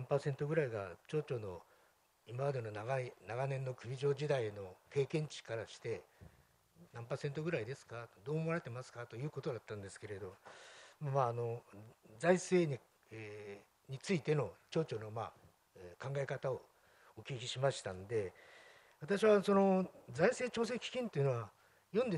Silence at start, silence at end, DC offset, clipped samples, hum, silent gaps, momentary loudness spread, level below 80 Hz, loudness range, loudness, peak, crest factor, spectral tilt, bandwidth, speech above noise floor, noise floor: 0 s; 0 s; under 0.1%; under 0.1%; none; none; 18 LU; -76 dBFS; 8 LU; -39 LUFS; -18 dBFS; 22 dB; -6 dB/octave; 12 kHz; 34 dB; -72 dBFS